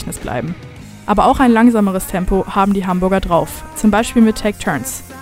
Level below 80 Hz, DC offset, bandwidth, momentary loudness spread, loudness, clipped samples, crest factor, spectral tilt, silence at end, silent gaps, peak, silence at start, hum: -32 dBFS; under 0.1%; 16 kHz; 14 LU; -15 LUFS; under 0.1%; 14 dB; -5.5 dB/octave; 0 s; none; -2 dBFS; 0 s; none